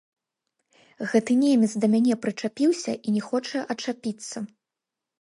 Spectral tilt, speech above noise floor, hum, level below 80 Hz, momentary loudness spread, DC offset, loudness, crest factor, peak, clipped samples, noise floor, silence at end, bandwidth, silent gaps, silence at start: -5 dB/octave; 63 dB; none; -74 dBFS; 14 LU; under 0.1%; -25 LUFS; 18 dB; -8 dBFS; under 0.1%; -87 dBFS; 0.75 s; 11.5 kHz; none; 1 s